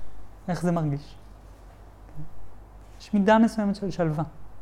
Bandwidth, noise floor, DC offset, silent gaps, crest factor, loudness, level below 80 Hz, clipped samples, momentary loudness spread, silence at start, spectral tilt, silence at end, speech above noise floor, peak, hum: 12 kHz; -47 dBFS; under 0.1%; none; 20 dB; -25 LUFS; -48 dBFS; under 0.1%; 25 LU; 0 s; -7.5 dB/octave; 0 s; 23 dB; -8 dBFS; none